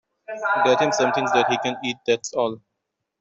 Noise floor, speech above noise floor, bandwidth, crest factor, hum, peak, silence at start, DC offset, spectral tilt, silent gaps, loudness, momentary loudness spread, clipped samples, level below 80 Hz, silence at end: -80 dBFS; 58 dB; 8 kHz; 16 dB; none; -6 dBFS; 0.3 s; under 0.1%; -3.5 dB/octave; none; -22 LUFS; 9 LU; under 0.1%; -68 dBFS; 0.65 s